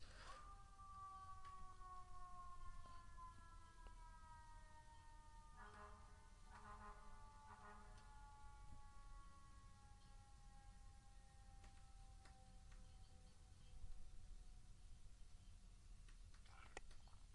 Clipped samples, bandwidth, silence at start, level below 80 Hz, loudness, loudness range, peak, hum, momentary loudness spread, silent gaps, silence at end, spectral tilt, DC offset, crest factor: under 0.1%; 11 kHz; 0 s; -64 dBFS; -64 LUFS; 6 LU; -38 dBFS; none; 7 LU; none; 0 s; -4 dB/octave; under 0.1%; 22 dB